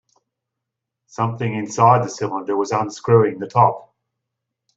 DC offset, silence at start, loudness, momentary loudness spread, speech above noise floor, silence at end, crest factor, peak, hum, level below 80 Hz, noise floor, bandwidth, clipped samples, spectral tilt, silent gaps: under 0.1%; 1.2 s; -19 LUFS; 10 LU; 64 dB; 0.95 s; 18 dB; -2 dBFS; none; -62 dBFS; -82 dBFS; 8 kHz; under 0.1%; -6.5 dB/octave; none